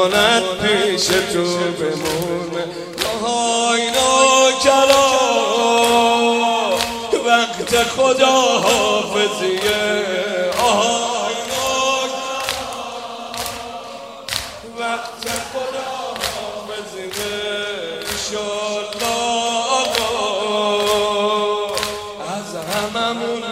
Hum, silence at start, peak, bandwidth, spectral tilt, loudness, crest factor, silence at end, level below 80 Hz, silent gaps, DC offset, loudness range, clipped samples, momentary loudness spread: none; 0 s; 0 dBFS; 16 kHz; -2 dB/octave; -17 LUFS; 18 dB; 0 s; -50 dBFS; none; under 0.1%; 11 LU; under 0.1%; 13 LU